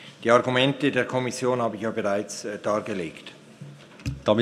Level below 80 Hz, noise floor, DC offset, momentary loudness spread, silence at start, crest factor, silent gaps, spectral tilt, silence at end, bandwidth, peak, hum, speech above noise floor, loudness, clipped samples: -52 dBFS; -44 dBFS; under 0.1%; 23 LU; 0 s; 22 dB; none; -5 dB/octave; 0 s; 14 kHz; -4 dBFS; none; 20 dB; -25 LUFS; under 0.1%